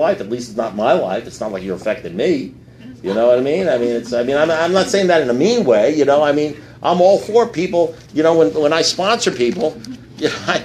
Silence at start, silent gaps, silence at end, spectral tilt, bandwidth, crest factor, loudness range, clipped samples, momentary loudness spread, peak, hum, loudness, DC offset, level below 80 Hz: 0 s; none; 0 s; -4.5 dB/octave; 13.5 kHz; 16 dB; 4 LU; under 0.1%; 10 LU; 0 dBFS; none; -16 LUFS; under 0.1%; -52 dBFS